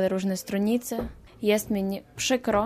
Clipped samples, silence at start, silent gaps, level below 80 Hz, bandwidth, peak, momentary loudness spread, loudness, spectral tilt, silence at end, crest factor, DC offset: under 0.1%; 0 s; none; -50 dBFS; 15.5 kHz; -10 dBFS; 8 LU; -27 LUFS; -4.5 dB/octave; 0 s; 16 dB; under 0.1%